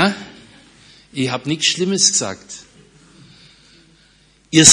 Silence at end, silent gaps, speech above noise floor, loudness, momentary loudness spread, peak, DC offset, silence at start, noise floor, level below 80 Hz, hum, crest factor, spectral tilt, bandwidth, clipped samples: 0 s; none; 34 dB; -16 LUFS; 22 LU; 0 dBFS; under 0.1%; 0 s; -53 dBFS; -58 dBFS; none; 18 dB; -2 dB/octave; 12 kHz; 0.2%